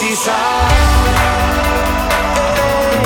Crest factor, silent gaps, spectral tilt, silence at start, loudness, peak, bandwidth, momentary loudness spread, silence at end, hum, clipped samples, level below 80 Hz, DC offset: 12 dB; none; -4 dB/octave; 0 s; -13 LUFS; 0 dBFS; 19 kHz; 3 LU; 0 s; none; under 0.1%; -18 dBFS; under 0.1%